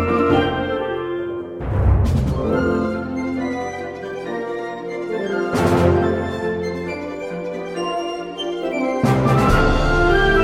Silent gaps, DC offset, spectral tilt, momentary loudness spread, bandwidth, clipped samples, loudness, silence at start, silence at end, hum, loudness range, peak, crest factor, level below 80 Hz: none; under 0.1%; -7 dB/octave; 11 LU; 15.5 kHz; under 0.1%; -20 LUFS; 0 s; 0 s; none; 4 LU; -2 dBFS; 18 dB; -28 dBFS